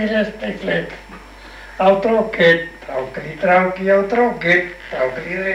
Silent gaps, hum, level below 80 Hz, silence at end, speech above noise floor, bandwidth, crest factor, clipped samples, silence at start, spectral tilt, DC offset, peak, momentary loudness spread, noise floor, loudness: none; none; -46 dBFS; 0 s; 20 dB; 11 kHz; 16 dB; under 0.1%; 0 s; -6.5 dB/octave; under 0.1%; -2 dBFS; 15 LU; -38 dBFS; -17 LUFS